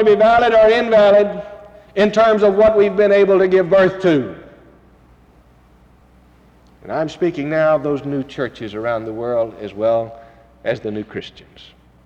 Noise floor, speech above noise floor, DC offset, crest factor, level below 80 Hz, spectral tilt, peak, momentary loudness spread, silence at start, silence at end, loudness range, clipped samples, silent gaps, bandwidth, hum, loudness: -49 dBFS; 34 dB; under 0.1%; 12 dB; -48 dBFS; -6.5 dB/octave; -4 dBFS; 15 LU; 0 s; 0.75 s; 10 LU; under 0.1%; none; 8 kHz; none; -15 LUFS